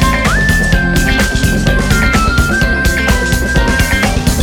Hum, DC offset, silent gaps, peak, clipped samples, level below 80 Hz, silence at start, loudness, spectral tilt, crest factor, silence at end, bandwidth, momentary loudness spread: none; under 0.1%; none; 0 dBFS; under 0.1%; -16 dBFS; 0 s; -12 LUFS; -4.5 dB/octave; 10 dB; 0 s; 19 kHz; 2 LU